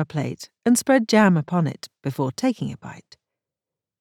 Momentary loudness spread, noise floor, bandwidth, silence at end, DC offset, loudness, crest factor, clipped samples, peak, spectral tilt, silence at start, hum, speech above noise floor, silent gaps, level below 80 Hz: 15 LU; -88 dBFS; 18 kHz; 1 s; under 0.1%; -22 LUFS; 20 dB; under 0.1%; -4 dBFS; -5.5 dB/octave; 0 s; none; 67 dB; none; -66 dBFS